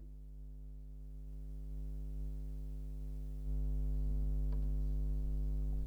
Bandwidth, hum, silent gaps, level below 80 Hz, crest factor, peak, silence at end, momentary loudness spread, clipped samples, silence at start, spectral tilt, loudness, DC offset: 1.3 kHz; 50 Hz at -40 dBFS; none; -38 dBFS; 10 dB; -28 dBFS; 0 s; 14 LU; under 0.1%; 0 s; -9.5 dB/octave; -43 LUFS; under 0.1%